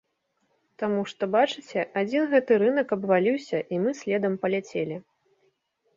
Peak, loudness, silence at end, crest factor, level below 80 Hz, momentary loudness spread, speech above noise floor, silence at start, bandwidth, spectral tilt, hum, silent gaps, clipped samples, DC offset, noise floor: -8 dBFS; -25 LUFS; 0.95 s; 18 dB; -72 dBFS; 9 LU; 49 dB; 0.8 s; 7.6 kHz; -6 dB/octave; none; none; under 0.1%; under 0.1%; -74 dBFS